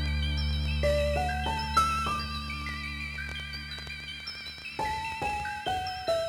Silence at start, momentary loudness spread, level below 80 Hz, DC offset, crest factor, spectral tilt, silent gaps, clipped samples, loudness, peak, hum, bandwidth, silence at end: 0 s; 10 LU; -38 dBFS; under 0.1%; 20 dB; -4.5 dB/octave; none; under 0.1%; -31 LUFS; -12 dBFS; none; 17 kHz; 0 s